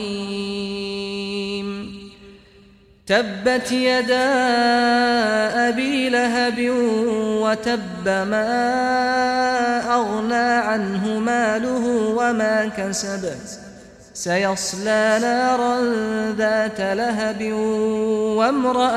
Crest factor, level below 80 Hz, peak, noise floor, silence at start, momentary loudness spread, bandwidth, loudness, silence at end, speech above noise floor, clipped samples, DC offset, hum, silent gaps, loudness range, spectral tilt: 16 dB; -54 dBFS; -4 dBFS; -50 dBFS; 0 s; 9 LU; 14.5 kHz; -20 LUFS; 0 s; 31 dB; under 0.1%; under 0.1%; none; none; 4 LU; -4 dB/octave